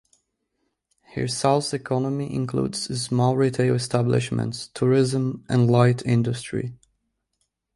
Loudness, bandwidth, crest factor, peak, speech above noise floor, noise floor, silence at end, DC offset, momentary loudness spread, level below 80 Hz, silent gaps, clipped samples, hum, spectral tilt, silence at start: -23 LUFS; 11.5 kHz; 20 dB; -4 dBFS; 53 dB; -75 dBFS; 1 s; under 0.1%; 9 LU; -56 dBFS; none; under 0.1%; none; -6 dB/octave; 1.15 s